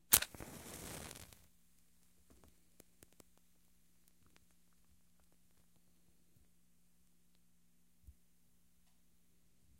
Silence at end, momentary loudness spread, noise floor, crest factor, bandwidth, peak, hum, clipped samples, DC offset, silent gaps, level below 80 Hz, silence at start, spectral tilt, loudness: 1.7 s; 24 LU; -76 dBFS; 42 dB; 16 kHz; -6 dBFS; none; under 0.1%; under 0.1%; none; -68 dBFS; 0.1 s; -0.5 dB/octave; -38 LUFS